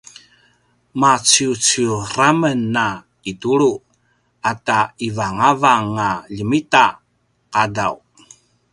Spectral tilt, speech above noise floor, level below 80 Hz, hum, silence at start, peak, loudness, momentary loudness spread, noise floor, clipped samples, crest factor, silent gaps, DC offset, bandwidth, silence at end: -3 dB/octave; 47 dB; -54 dBFS; 60 Hz at -50 dBFS; 0.95 s; 0 dBFS; -17 LUFS; 11 LU; -64 dBFS; under 0.1%; 18 dB; none; under 0.1%; 11.5 kHz; 0.75 s